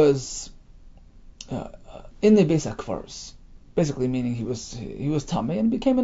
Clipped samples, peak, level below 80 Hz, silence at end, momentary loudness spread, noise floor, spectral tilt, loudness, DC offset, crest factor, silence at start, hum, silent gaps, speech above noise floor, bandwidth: under 0.1%; -6 dBFS; -46 dBFS; 0 s; 22 LU; -47 dBFS; -6.5 dB/octave; -25 LUFS; under 0.1%; 18 dB; 0 s; none; none; 24 dB; 8 kHz